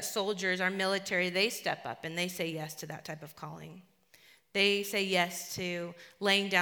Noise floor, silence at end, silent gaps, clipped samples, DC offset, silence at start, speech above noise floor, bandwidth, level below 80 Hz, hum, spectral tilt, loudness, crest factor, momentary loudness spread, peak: -62 dBFS; 0 s; none; under 0.1%; under 0.1%; 0 s; 29 dB; over 20 kHz; -76 dBFS; none; -3 dB/octave; -31 LUFS; 22 dB; 17 LU; -12 dBFS